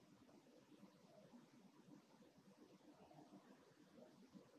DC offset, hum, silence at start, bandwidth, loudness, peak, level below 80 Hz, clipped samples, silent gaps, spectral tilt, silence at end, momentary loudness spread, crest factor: under 0.1%; none; 0 s; 11 kHz; -68 LUFS; -52 dBFS; under -90 dBFS; under 0.1%; none; -5.5 dB/octave; 0 s; 4 LU; 16 dB